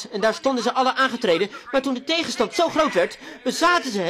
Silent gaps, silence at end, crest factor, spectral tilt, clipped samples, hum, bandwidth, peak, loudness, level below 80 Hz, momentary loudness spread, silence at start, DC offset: none; 0 s; 14 dB; -3 dB/octave; under 0.1%; none; 16 kHz; -8 dBFS; -21 LUFS; -60 dBFS; 5 LU; 0 s; under 0.1%